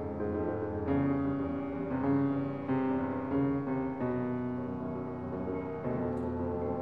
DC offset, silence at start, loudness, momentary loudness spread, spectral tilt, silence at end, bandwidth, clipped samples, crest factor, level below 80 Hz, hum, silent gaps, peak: 0.1%; 0 s; -33 LUFS; 6 LU; -11 dB/octave; 0 s; 4.5 kHz; under 0.1%; 14 dB; -56 dBFS; none; none; -18 dBFS